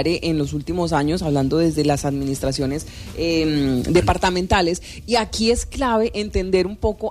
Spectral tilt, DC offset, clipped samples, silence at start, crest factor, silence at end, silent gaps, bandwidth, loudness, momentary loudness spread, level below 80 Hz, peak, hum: -5.5 dB/octave; under 0.1%; under 0.1%; 0 s; 14 dB; 0 s; none; 15.5 kHz; -20 LUFS; 6 LU; -34 dBFS; -4 dBFS; none